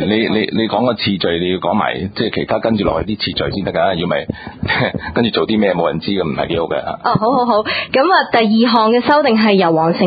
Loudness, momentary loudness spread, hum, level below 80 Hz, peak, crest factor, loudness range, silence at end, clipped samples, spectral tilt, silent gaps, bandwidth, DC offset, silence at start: -15 LUFS; 7 LU; none; -40 dBFS; 0 dBFS; 14 dB; 4 LU; 0 s; under 0.1%; -9 dB/octave; none; 5 kHz; under 0.1%; 0 s